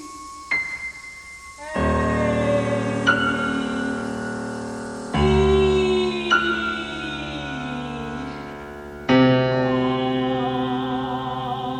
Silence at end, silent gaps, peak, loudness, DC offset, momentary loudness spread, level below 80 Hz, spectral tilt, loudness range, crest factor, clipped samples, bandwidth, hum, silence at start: 0 s; none; -4 dBFS; -22 LUFS; under 0.1%; 15 LU; -38 dBFS; -6 dB/octave; 2 LU; 18 dB; under 0.1%; 11 kHz; none; 0 s